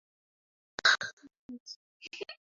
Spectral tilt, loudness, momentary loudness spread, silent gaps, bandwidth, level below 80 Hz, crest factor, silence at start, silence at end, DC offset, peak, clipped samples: 3 dB/octave; -28 LUFS; 23 LU; 1.13-1.17 s, 1.37-1.49 s, 1.60-1.66 s, 1.76-2.00 s; 7.6 kHz; -78 dBFS; 24 dB; 0.85 s; 0.2 s; under 0.1%; -12 dBFS; under 0.1%